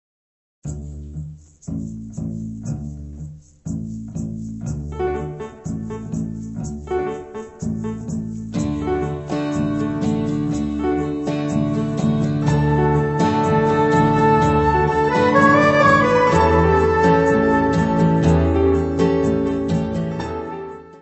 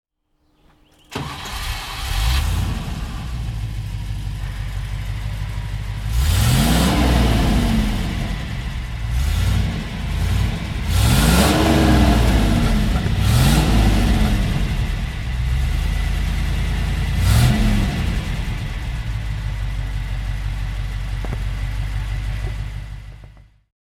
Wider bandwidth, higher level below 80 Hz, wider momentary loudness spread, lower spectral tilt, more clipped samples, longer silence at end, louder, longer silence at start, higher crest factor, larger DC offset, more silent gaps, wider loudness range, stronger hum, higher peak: second, 8.4 kHz vs 17 kHz; second, -34 dBFS vs -22 dBFS; first, 17 LU vs 13 LU; first, -7.5 dB/octave vs -5.5 dB/octave; neither; second, 0.05 s vs 0.4 s; about the same, -19 LUFS vs -21 LUFS; second, 0.65 s vs 1.1 s; about the same, 18 dB vs 18 dB; neither; neither; first, 15 LU vs 10 LU; neither; about the same, -2 dBFS vs -2 dBFS